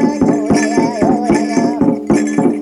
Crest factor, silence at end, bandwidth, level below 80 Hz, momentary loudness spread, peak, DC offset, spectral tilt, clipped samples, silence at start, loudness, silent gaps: 12 dB; 0 s; 11.5 kHz; -42 dBFS; 2 LU; -2 dBFS; under 0.1%; -6 dB/octave; under 0.1%; 0 s; -14 LUFS; none